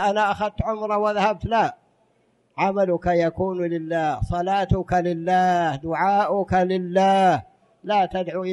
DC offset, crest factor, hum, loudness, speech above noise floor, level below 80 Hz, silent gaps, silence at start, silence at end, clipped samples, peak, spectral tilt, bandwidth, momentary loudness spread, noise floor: under 0.1%; 14 dB; none; -22 LUFS; 43 dB; -42 dBFS; none; 0 s; 0 s; under 0.1%; -6 dBFS; -6.5 dB/octave; 11 kHz; 6 LU; -64 dBFS